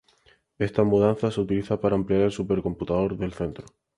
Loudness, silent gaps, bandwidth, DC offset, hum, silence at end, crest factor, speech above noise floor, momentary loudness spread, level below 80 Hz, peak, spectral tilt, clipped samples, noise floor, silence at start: -25 LUFS; none; 11 kHz; under 0.1%; none; 0.35 s; 18 dB; 37 dB; 9 LU; -48 dBFS; -6 dBFS; -8 dB/octave; under 0.1%; -61 dBFS; 0.6 s